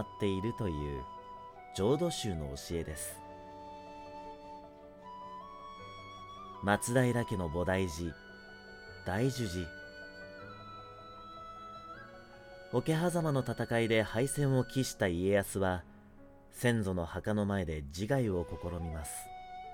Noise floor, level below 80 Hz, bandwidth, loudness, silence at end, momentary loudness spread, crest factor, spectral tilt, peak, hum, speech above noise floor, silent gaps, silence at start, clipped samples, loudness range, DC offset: -56 dBFS; -54 dBFS; 19 kHz; -34 LUFS; 0 s; 19 LU; 20 dB; -5.5 dB/octave; -14 dBFS; none; 23 dB; none; 0 s; under 0.1%; 12 LU; under 0.1%